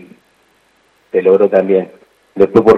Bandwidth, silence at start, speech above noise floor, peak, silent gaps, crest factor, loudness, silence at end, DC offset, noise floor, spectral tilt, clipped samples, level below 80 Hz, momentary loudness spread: 6.2 kHz; 1.15 s; 45 dB; 0 dBFS; none; 14 dB; -12 LUFS; 0 s; under 0.1%; -55 dBFS; -8.5 dB/octave; 0.5%; -50 dBFS; 16 LU